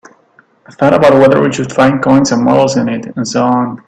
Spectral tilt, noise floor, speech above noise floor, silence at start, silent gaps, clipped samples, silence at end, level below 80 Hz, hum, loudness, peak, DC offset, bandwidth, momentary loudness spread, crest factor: -6 dB/octave; -49 dBFS; 39 dB; 0.7 s; none; under 0.1%; 0.1 s; -46 dBFS; none; -10 LUFS; 0 dBFS; under 0.1%; 9.2 kHz; 8 LU; 10 dB